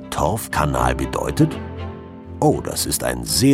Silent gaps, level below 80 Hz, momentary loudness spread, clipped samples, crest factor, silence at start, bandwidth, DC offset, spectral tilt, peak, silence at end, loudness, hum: none; -34 dBFS; 13 LU; under 0.1%; 18 dB; 0 s; 16.5 kHz; under 0.1%; -4.5 dB/octave; -2 dBFS; 0 s; -20 LUFS; none